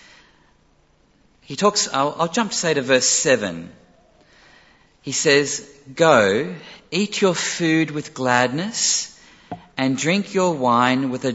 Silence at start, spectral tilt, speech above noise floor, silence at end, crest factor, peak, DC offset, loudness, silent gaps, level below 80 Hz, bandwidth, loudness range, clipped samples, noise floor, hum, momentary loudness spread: 1.5 s; -3 dB/octave; 39 dB; 0 s; 20 dB; -2 dBFS; under 0.1%; -19 LUFS; none; -62 dBFS; 8.2 kHz; 2 LU; under 0.1%; -58 dBFS; none; 16 LU